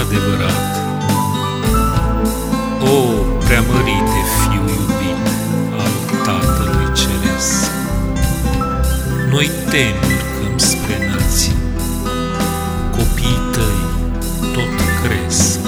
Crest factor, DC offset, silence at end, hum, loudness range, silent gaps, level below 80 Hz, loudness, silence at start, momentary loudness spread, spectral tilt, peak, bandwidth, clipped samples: 16 dB; under 0.1%; 0 s; none; 2 LU; none; -22 dBFS; -16 LUFS; 0 s; 5 LU; -4.5 dB/octave; 0 dBFS; over 20 kHz; under 0.1%